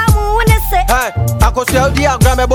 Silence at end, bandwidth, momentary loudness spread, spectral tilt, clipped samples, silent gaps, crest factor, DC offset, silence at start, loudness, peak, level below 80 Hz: 0 s; over 20 kHz; 2 LU; -5 dB/octave; under 0.1%; none; 10 dB; under 0.1%; 0 s; -12 LUFS; 0 dBFS; -16 dBFS